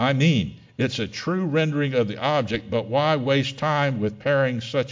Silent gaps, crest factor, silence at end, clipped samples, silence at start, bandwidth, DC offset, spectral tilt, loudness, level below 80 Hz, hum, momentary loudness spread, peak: none; 16 dB; 0 s; under 0.1%; 0 s; 7.6 kHz; under 0.1%; -6.5 dB/octave; -23 LUFS; -52 dBFS; none; 6 LU; -6 dBFS